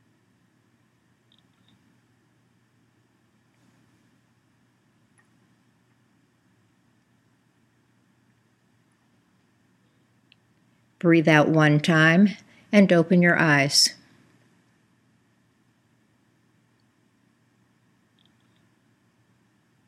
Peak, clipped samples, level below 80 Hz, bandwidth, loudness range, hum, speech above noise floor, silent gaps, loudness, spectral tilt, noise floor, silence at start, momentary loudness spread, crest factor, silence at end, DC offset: -2 dBFS; under 0.1%; -78 dBFS; 15 kHz; 8 LU; none; 47 dB; none; -19 LUFS; -5 dB/octave; -65 dBFS; 11.05 s; 5 LU; 26 dB; 5.95 s; under 0.1%